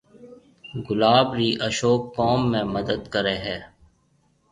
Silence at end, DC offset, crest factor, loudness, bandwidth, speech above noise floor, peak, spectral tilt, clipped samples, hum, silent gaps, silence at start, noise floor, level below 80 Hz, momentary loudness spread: 0.85 s; under 0.1%; 22 dB; -22 LUFS; 10.5 kHz; 42 dB; -2 dBFS; -5 dB/octave; under 0.1%; none; none; 0.2 s; -64 dBFS; -52 dBFS; 13 LU